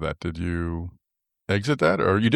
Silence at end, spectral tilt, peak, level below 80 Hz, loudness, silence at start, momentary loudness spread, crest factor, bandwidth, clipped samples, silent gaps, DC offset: 0 s; -7 dB/octave; -8 dBFS; -44 dBFS; -25 LUFS; 0 s; 15 LU; 16 dB; 12 kHz; under 0.1%; none; under 0.1%